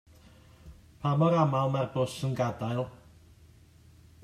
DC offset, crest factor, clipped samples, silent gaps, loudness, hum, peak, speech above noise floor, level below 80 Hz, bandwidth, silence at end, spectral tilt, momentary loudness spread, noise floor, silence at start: under 0.1%; 20 dB; under 0.1%; none; -29 LUFS; none; -12 dBFS; 29 dB; -60 dBFS; 13.5 kHz; 1.3 s; -7.5 dB/octave; 10 LU; -57 dBFS; 0.65 s